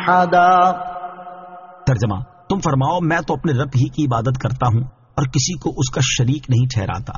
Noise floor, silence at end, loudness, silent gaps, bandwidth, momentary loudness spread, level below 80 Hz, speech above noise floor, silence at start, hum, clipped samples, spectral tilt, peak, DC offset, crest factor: -38 dBFS; 0 s; -18 LUFS; none; 7.4 kHz; 15 LU; -40 dBFS; 21 dB; 0 s; none; under 0.1%; -5.5 dB/octave; -2 dBFS; under 0.1%; 16 dB